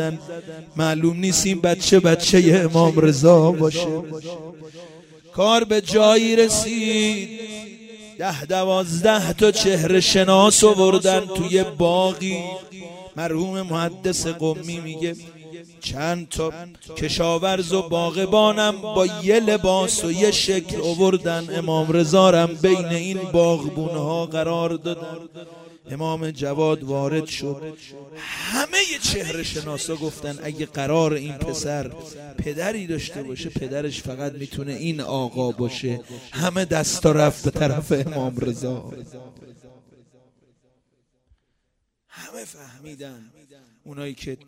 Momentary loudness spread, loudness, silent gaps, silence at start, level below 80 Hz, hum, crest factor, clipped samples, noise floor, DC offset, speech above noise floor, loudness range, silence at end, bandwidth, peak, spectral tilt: 20 LU; -20 LUFS; none; 0 s; -48 dBFS; none; 20 dB; under 0.1%; -73 dBFS; under 0.1%; 53 dB; 11 LU; 0.15 s; 16 kHz; -2 dBFS; -4.5 dB/octave